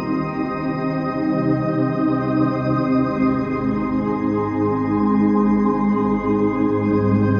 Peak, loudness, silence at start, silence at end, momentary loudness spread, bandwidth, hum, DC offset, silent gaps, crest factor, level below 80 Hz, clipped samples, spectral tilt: -6 dBFS; -20 LUFS; 0 s; 0 s; 5 LU; 6.6 kHz; none; under 0.1%; none; 12 dB; -44 dBFS; under 0.1%; -10 dB/octave